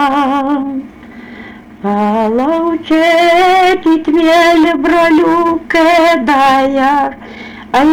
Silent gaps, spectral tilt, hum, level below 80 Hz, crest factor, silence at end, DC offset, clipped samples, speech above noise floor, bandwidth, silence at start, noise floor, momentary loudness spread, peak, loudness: none; -4.5 dB/octave; none; -42 dBFS; 6 dB; 0 s; under 0.1%; under 0.1%; 22 dB; 19 kHz; 0 s; -32 dBFS; 14 LU; -4 dBFS; -10 LUFS